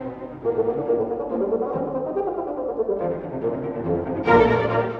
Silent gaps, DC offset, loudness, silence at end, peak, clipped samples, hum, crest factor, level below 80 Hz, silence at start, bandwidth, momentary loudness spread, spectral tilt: none; under 0.1%; -23 LUFS; 0 s; -2 dBFS; under 0.1%; none; 20 dB; -48 dBFS; 0 s; 6 kHz; 10 LU; -8.5 dB/octave